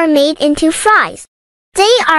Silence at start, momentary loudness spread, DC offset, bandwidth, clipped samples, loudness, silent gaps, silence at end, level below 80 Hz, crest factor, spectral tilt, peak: 0 s; 7 LU; under 0.1%; 14 kHz; under 0.1%; -11 LUFS; 1.28-1.72 s; 0 s; -42 dBFS; 12 dB; -2 dB/octave; 0 dBFS